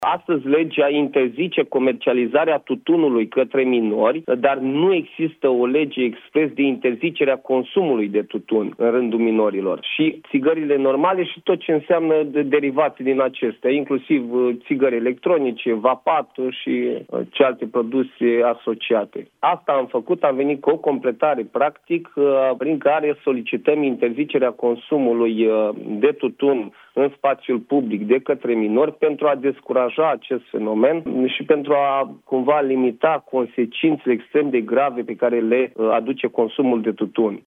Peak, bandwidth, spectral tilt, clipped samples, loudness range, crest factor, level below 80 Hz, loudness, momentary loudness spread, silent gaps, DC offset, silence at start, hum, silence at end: -2 dBFS; 3.9 kHz; -8.5 dB/octave; under 0.1%; 2 LU; 18 dB; -74 dBFS; -20 LUFS; 5 LU; none; under 0.1%; 0 s; none; 0.05 s